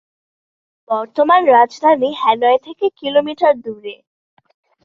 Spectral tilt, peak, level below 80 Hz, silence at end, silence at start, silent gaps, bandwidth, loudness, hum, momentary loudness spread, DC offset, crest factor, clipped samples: -4.5 dB/octave; -2 dBFS; -66 dBFS; 0.9 s; 0.9 s; none; 7.2 kHz; -15 LUFS; none; 11 LU; under 0.1%; 14 dB; under 0.1%